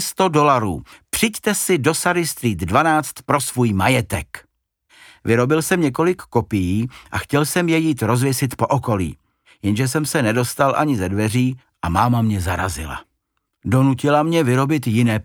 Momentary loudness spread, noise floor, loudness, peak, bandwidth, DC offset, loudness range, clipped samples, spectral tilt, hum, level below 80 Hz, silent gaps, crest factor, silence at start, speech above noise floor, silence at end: 10 LU; -73 dBFS; -19 LUFS; -2 dBFS; over 20 kHz; under 0.1%; 2 LU; under 0.1%; -5.5 dB/octave; none; -44 dBFS; none; 18 dB; 0 s; 55 dB; 0 s